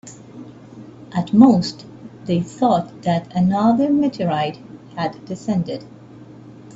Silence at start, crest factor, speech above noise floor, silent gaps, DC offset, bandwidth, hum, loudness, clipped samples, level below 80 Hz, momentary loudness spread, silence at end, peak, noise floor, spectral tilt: 0.05 s; 20 dB; 23 dB; none; under 0.1%; 8 kHz; none; -19 LUFS; under 0.1%; -56 dBFS; 26 LU; 0.25 s; 0 dBFS; -41 dBFS; -7.5 dB/octave